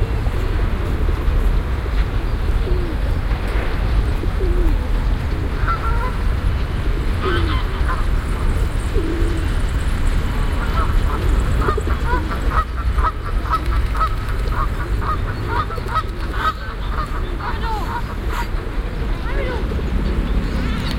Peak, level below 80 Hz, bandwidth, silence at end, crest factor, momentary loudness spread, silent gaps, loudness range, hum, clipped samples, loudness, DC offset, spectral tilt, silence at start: -2 dBFS; -20 dBFS; 15.5 kHz; 0 s; 16 dB; 4 LU; none; 3 LU; none; under 0.1%; -22 LUFS; under 0.1%; -6.5 dB/octave; 0 s